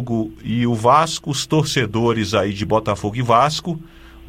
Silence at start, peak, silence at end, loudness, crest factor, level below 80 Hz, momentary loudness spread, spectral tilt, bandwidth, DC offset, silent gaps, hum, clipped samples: 0 s; -2 dBFS; 0 s; -18 LUFS; 18 dB; -44 dBFS; 9 LU; -5 dB/octave; 16 kHz; under 0.1%; none; none; under 0.1%